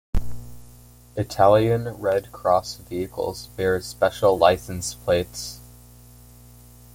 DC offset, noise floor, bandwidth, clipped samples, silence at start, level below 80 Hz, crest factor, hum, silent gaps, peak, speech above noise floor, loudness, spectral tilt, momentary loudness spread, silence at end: under 0.1%; -48 dBFS; 17 kHz; under 0.1%; 0.15 s; -40 dBFS; 20 dB; 60 Hz at -45 dBFS; none; -4 dBFS; 26 dB; -23 LUFS; -5 dB/octave; 16 LU; 1.3 s